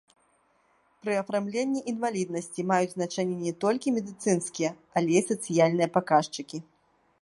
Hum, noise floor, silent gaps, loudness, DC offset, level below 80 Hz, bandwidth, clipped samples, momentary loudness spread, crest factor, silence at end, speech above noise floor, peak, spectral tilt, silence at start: none; -67 dBFS; none; -28 LUFS; under 0.1%; -74 dBFS; 11.5 kHz; under 0.1%; 9 LU; 20 dB; 0.6 s; 40 dB; -8 dBFS; -5 dB/octave; 1.05 s